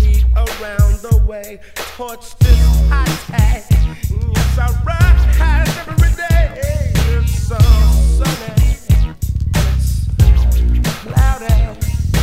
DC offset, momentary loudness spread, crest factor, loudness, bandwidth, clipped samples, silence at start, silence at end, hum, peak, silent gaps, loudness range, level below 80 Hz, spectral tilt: 1%; 8 LU; 12 dB; -15 LUFS; 16 kHz; under 0.1%; 0 s; 0 s; none; 0 dBFS; none; 1 LU; -14 dBFS; -6 dB/octave